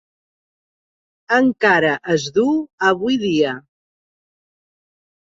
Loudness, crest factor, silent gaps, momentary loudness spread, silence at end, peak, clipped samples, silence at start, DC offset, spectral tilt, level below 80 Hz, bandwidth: -17 LUFS; 18 dB; 2.73-2.78 s; 5 LU; 1.65 s; -2 dBFS; under 0.1%; 1.3 s; under 0.1%; -5 dB/octave; -60 dBFS; 7.8 kHz